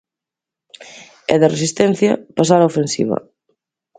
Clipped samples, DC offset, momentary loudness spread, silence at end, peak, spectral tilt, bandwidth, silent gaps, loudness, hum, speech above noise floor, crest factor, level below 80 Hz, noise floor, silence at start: under 0.1%; under 0.1%; 11 LU; 0.8 s; 0 dBFS; -5.5 dB/octave; 9.6 kHz; none; -16 LUFS; none; 71 dB; 18 dB; -58 dBFS; -86 dBFS; 0.8 s